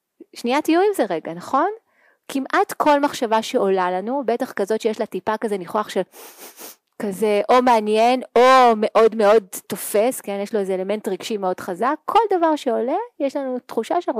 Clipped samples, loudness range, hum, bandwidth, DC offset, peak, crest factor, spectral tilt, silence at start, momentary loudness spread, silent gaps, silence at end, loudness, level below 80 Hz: under 0.1%; 6 LU; none; 15.5 kHz; under 0.1%; -6 dBFS; 12 dB; -4.5 dB/octave; 0.2 s; 12 LU; none; 0 s; -20 LUFS; -64 dBFS